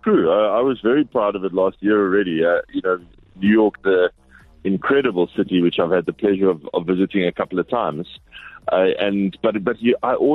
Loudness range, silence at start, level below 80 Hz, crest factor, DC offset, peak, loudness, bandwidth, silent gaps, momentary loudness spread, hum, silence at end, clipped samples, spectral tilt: 2 LU; 0.05 s; -54 dBFS; 12 dB; under 0.1%; -6 dBFS; -19 LUFS; 4.2 kHz; none; 7 LU; none; 0 s; under 0.1%; -9 dB/octave